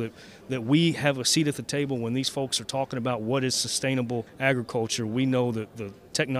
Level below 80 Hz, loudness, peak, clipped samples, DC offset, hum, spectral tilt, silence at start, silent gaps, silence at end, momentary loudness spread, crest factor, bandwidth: -64 dBFS; -26 LUFS; -8 dBFS; under 0.1%; under 0.1%; none; -4 dB/octave; 0 s; none; 0 s; 10 LU; 20 dB; 15.5 kHz